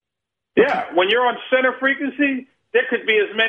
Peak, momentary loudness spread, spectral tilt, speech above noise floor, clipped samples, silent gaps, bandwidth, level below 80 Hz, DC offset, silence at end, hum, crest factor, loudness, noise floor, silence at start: -2 dBFS; 4 LU; -5.5 dB/octave; 65 dB; under 0.1%; none; 6.4 kHz; -66 dBFS; under 0.1%; 0 s; none; 18 dB; -19 LUFS; -83 dBFS; 0.55 s